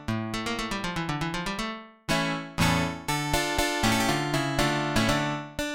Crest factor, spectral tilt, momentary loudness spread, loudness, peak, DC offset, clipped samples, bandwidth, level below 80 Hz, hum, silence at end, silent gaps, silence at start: 18 dB; -4 dB/octave; 6 LU; -27 LUFS; -10 dBFS; 0.1%; under 0.1%; 17 kHz; -42 dBFS; none; 0 s; none; 0 s